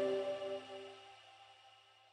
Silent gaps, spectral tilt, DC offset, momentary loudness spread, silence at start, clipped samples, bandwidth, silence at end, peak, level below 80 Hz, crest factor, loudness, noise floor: none; -4.5 dB/octave; under 0.1%; 22 LU; 0 s; under 0.1%; 10.5 kHz; 0.3 s; -28 dBFS; -88 dBFS; 16 dB; -43 LUFS; -65 dBFS